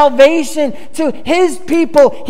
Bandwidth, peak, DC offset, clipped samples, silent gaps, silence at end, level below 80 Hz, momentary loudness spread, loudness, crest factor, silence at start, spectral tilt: 15 kHz; 0 dBFS; 8%; 0.9%; none; 0 s; -48 dBFS; 9 LU; -12 LUFS; 12 dB; 0 s; -4 dB/octave